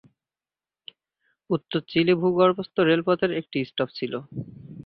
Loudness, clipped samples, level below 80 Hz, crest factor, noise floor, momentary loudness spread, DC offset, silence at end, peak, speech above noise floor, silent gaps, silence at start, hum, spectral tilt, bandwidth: -24 LUFS; under 0.1%; -64 dBFS; 20 dB; under -90 dBFS; 13 LU; under 0.1%; 0.05 s; -6 dBFS; over 67 dB; none; 1.5 s; none; -9.5 dB/octave; 5.4 kHz